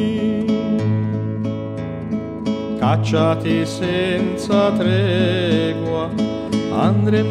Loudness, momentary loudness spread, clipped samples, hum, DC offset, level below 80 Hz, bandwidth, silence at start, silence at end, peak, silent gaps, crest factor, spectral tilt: -19 LUFS; 7 LU; under 0.1%; none; under 0.1%; -48 dBFS; 10.5 kHz; 0 s; 0 s; -4 dBFS; none; 14 dB; -7 dB/octave